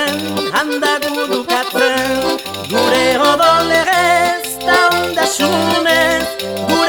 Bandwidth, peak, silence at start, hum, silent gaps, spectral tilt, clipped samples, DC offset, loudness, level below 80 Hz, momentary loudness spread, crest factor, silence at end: 19.5 kHz; 0 dBFS; 0 s; none; none; -2.5 dB/octave; under 0.1%; under 0.1%; -14 LUFS; -46 dBFS; 7 LU; 14 dB; 0 s